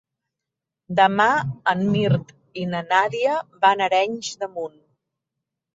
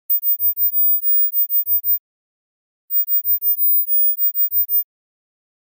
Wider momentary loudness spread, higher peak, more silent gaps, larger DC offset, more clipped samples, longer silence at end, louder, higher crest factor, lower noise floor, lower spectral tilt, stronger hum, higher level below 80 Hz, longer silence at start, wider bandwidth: first, 13 LU vs 6 LU; first, -4 dBFS vs -12 dBFS; second, none vs 1.99-2.88 s; neither; neither; about the same, 1.05 s vs 0.95 s; second, -21 LUFS vs -14 LUFS; first, 20 dB vs 8 dB; second, -85 dBFS vs under -90 dBFS; first, -5.5 dB/octave vs -0.5 dB/octave; neither; first, -60 dBFS vs under -90 dBFS; first, 0.9 s vs 0.1 s; second, 7.8 kHz vs 16 kHz